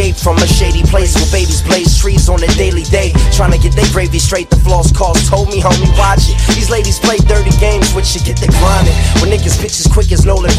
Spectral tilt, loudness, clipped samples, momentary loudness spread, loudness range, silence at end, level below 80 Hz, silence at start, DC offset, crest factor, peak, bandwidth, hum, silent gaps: -4.5 dB/octave; -10 LUFS; 0.2%; 2 LU; 0 LU; 0 s; -12 dBFS; 0 s; under 0.1%; 8 dB; 0 dBFS; 15 kHz; none; none